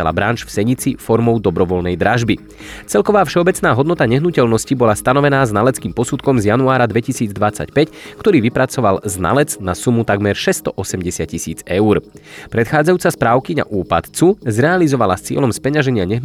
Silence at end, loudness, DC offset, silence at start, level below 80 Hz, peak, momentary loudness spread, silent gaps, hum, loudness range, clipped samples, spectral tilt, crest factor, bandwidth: 0 s; -15 LUFS; under 0.1%; 0 s; -42 dBFS; -2 dBFS; 7 LU; none; none; 3 LU; under 0.1%; -5.5 dB/octave; 14 dB; 16 kHz